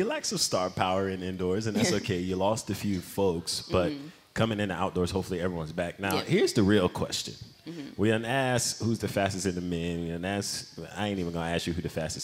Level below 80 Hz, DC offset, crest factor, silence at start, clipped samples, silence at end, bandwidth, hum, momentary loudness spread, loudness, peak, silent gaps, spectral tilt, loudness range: -54 dBFS; under 0.1%; 20 dB; 0 s; under 0.1%; 0 s; 16 kHz; none; 8 LU; -29 LUFS; -8 dBFS; none; -4.5 dB/octave; 3 LU